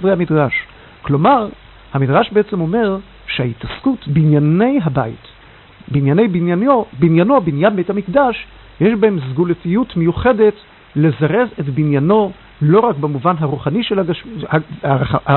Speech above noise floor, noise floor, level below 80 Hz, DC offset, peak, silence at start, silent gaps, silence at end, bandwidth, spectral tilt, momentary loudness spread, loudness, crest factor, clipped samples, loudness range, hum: 27 dB; -42 dBFS; -42 dBFS; under 0.1%; 0 dBFS; 0 s; none; 0 s; 4.3 kHz; -12.5 dB/octave; 9 LU; -15 LUFS; 14 dB; under 0.1%; 2 LU; none